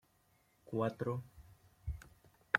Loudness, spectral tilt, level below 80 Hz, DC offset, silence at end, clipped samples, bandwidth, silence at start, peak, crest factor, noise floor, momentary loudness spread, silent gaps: -42 LUFS; -7 dB/octave; -58 dBFS; under 0.1%; 0 s; under 0.1%; 16.5 kHz; 0.65 s; -10 dBFS; 32 dB; -73 dBFS; 23 LU; none